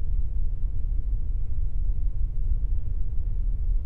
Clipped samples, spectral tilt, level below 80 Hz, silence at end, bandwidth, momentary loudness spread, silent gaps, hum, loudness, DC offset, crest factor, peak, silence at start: under 0.1%; -11 dB/octave; -26 dBFS; 0 s; 0.8 kHz; 2 LU; none; none; -32 LUFS; under 0.1%; 10 dB; -14 dBFS; 0 s